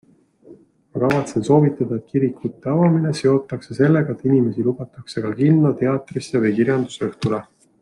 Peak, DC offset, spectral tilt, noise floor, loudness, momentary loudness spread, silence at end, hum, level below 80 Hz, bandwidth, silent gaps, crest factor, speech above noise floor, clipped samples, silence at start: -2 dBFS; under 0.1%; -8 dB/octave; -48 dBFS; -19 LUFS; 10 LU; 0.4 s; none; -58 dBFS; 11 kHz; none; 18 dB; 29 dB; under 0.1%; 0.5 s